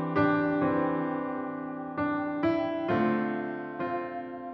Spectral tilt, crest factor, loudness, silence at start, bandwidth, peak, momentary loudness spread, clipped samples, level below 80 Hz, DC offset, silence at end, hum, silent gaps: -9.5 dB/octave; 14 dB; -30 LUFS; 0 s; 5.8 kHz; -14 dBFS; 10 LU; under 0.1%; -64 dBFS; under 0.1%; 0 s; none; none